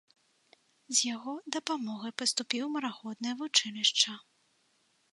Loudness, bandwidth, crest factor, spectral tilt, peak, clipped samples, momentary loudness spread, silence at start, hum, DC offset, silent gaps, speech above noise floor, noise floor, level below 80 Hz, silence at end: -30 LUFS; 11.5 kHz; 24 dB; -0.5 dB/octave; -10 dBFS; under 0.1%; 12 LU; 0.9 s; none; under 0.1%; none; 39 dB; -72 dBFS; -88 dBFS; 0.95 s